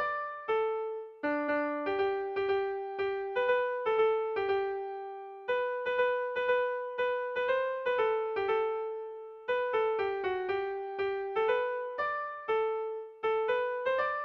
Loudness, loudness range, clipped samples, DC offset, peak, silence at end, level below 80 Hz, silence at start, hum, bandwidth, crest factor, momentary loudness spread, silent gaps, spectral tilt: -32 LUFS; 2 LU; under 0.1%; under 0.1%; -18 dBFS; 0 s; -70 dBFS; 0 s; none; 6 kHz; 14 dB; 7 LU; none; -5.5 dB/octave